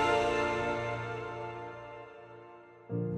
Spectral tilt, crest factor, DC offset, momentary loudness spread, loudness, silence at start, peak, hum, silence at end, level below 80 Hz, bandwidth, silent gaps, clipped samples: -5.5 dB/octave; 18 dB; under 0.1%; 22 LU; -34 LUFS; 0 s; -16 dBFS; none; 0 s; -58 dBFS; 12 kHz; none; under 0.1%